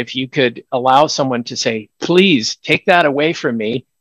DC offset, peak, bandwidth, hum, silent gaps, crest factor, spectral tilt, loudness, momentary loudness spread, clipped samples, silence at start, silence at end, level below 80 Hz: under 0.1%; 0 dBFS; 12 kHz; none; none; 16 dB; -4.5 dB/octave; -15 LUFS; 8 LU; 0.1%; 0 s; 0.2 s; -60 dBFS